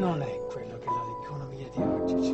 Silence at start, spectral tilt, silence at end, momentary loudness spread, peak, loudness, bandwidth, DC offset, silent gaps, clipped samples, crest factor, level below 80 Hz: 0 s; -7.5 dB/octave; 0 s; 10 LU; -14 dBFS; -32 LUFS; 8.4 kHz; under 0.1%; none; under 0.1%; 16 dB; -54 dBFS